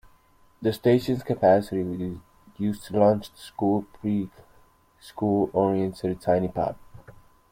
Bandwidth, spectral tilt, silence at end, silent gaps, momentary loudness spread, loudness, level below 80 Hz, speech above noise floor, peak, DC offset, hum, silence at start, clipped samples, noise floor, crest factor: 16.5 kHz; -8 dB/octave; 0.4 s; none; 12 LU; -25 LUFS; -56 dBFS; 34 dB; -6 dBFS; under 0.1%; none; 0.6 s; under 0.1%; -58 dBFS; 20 dB